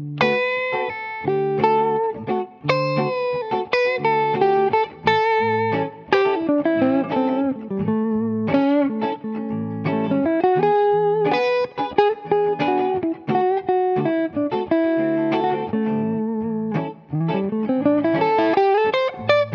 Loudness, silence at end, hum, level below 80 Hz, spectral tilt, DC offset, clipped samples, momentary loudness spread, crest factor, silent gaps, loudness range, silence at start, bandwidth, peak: -20 LUFS; 0 s; none; -62 dBFS; -8 dB/octave; under 0.1%; under 0.1%; 7 LU; 16 dB; none; 3 LU; 0 s; 7 kHz; -4 dBFS